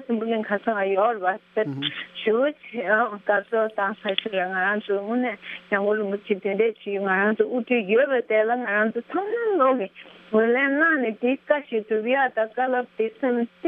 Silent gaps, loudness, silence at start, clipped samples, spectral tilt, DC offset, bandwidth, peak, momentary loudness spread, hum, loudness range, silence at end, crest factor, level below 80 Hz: none; -23 LUFS; 0 s; under 0.1%; -8 dB/octave; under 0.1%; 4.2 kHz; -6 dBFS; 7 LU; none; 2 LU; 0 s; 18 dB; -76 dBFS